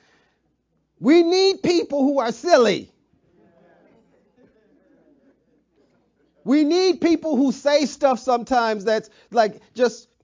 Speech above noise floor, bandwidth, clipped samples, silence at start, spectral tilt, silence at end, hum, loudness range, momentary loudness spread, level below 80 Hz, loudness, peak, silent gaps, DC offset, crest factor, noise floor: 50 dB; 7.6 kHz; under 0.1%; 1 s; -4.5 dB/octave; 0.25 s; none; 5 LU; 7 LU; -64 dBFS; -20 LUFS; -4 dBFS; none; under 0.1%; 18 dB; -69 dBFS